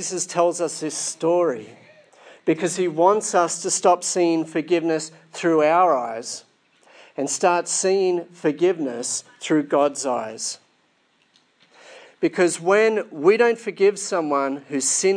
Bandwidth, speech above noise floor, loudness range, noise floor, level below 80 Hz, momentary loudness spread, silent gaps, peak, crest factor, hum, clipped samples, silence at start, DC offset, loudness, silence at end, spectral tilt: 10.5 kHz; 43 dB; 4 LU; -64 dBFS; -82 dBFS; 10 LU; none; -4 dBFS; 18 dB; none; under 0.1%; 0 s; under 0.1%; -21 LUFS; 0 s; -3.5 dB/octave